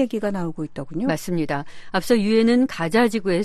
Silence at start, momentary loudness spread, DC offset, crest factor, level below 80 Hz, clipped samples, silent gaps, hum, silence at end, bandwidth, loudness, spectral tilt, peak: 0 s; 12 LU; under 0.1%; 16 dB; -50 dBFS; under 0.1%; none; none; 0 s; 13.5 kHz; -22 LUFS; -6 dB/octave; -6 dBFS